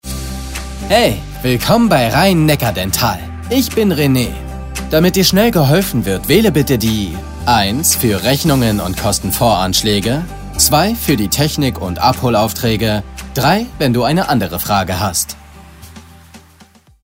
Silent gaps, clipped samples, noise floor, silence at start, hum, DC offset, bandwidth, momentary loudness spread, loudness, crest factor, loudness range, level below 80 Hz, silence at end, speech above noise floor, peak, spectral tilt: none; under 0.1%; -45 dBFS; 0.05 s; none; 0.2%; 16.5 kHz; 10 LU; -14 LUFS; 14 dB; 3 LU; -30 dBFS; 0.65 s; 32 dB; 0 dBFS; -4.5 dB/octave